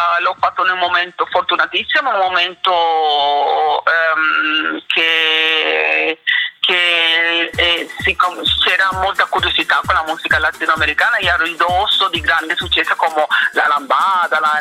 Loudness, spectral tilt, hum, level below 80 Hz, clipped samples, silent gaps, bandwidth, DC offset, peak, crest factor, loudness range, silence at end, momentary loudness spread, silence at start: -14 LUFS; -2.5 dB/octave; none; -42 dBFS; under 0.1%; none; 16.5 kHz; under 0.1%; 0 dBFS; 14 dB; 2 LU; 0 s; 4 LU; 0 s